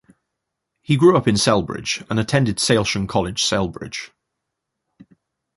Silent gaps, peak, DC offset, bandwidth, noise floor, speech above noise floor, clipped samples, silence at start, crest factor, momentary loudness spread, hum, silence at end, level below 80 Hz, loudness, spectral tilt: none; -2 dBFS; under 0.1%; 11.5 kHz; -80 dBFS; 61 dB; under 0.1%; 0.9 s; 20 dB; 14 LU; none; 1.5 s; -46 dBFS; -19 LUFS; -4.5 dB/octave